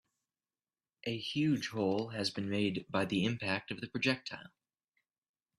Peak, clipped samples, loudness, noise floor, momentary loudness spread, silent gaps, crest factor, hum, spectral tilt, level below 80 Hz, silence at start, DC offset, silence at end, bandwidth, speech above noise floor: -16 dBFS; under 0.1%; -35 LUFS; under -90 dBFS; 8 LU; none; 22 dB; none; -5.5 dB/octave; -72 dBFS; 1.05 s; under 0.1%; 1.1 s; 13.5 kHz; over 55 dB